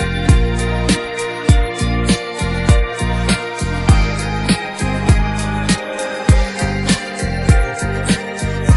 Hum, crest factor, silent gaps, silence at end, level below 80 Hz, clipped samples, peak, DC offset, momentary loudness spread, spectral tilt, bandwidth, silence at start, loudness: none; 14 dB; none; 0 s; -20 dBFS; under 0.1%; 0 dBFS; under 0.1%; 5 LU; -5 dB/octave; 11.5 kHz; 0 s; -17 LUFS